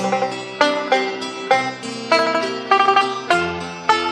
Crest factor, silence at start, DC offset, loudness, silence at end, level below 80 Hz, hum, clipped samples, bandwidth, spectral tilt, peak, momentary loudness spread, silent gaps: 18 dB; 0 s; under 0.1%; -19 LUFS; 0 s; -60 dBFS; none; under 0.1%; 12 kHz; -3.5 dB/octave; -2 dBFS; 9 LU; none